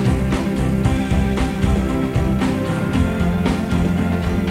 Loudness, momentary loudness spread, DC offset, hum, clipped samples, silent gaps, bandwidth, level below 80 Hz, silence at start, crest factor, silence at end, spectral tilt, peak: -19 LUFS; 1 LU; under 0.1%; none; under 0.1%; none; 16 kHz; -26 dBFS; 0 s; 14 dB; 0 s; -7 dB/octave; -4 dBFS